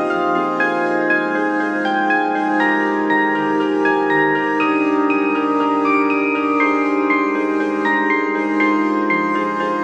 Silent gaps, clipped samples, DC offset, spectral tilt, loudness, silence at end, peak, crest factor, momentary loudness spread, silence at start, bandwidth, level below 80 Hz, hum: none; under 0.1%; under 0.1%; -6 dB/octave; -17 LUFS; 0 s; -4 dBFS; 14 dB; 3 LU; 0 s; 8 kHz; -70 dBFS; none